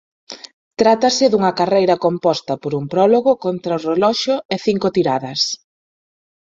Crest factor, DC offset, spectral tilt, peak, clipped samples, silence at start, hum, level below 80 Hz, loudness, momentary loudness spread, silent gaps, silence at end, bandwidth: 16 dB; under 0.1%; -4.5 dB/octave; -2 dBFS; under 0.1%; 0.3 s; none; -60 dBFS; -17 LUFS; 12 LU; 0.53-0.71 s, 4.45-4.49 s; 1 s; 7.8 kHz